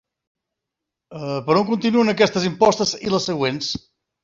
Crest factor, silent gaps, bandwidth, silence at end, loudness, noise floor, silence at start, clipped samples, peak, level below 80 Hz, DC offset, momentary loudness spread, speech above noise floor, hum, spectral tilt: 18 dB; none; 7.8 kHz; 0.45 s; -19 LUFS; -83 dBFS; 1.1 s; under 0.1%; -2 dBFS; -56 dBFS; under 0.1%; 11 LU; 64 dB; none; -4.5 dB/octave